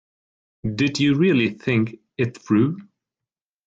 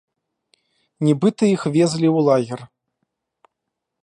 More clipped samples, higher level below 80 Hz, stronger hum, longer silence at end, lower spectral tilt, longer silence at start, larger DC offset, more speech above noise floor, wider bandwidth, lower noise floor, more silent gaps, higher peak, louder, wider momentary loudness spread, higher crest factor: neither; first, -56 dBFS vs -66 dBFS; neither; second, 0.85 s vs 1.35 s; about the same, -6.5 dB/octave vs -7 dB/octave; second, 0.65 s vs 1 s; neither; first, 69 dB vs 63 dB; second, 7.8 kHz vs 11 kHz; first, -89 dBFS vs -80 dBFS; neither; second, -8 dBFS vs -4 dBFS; second, -21 LUFS vs -18 LUFS; first, 11 LU vs 7 LU; about the same, 16 dB vs 16 dB